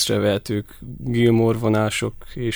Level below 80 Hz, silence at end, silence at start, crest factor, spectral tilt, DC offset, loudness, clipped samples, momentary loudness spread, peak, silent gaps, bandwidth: -44 dBFS; 0 s; 0 s; 16 dB; -5.5 dB/octave; under 0.1%; -21 LUFS; under 0.1%; 12 LU; -6 dBFS; none; over 20 kHz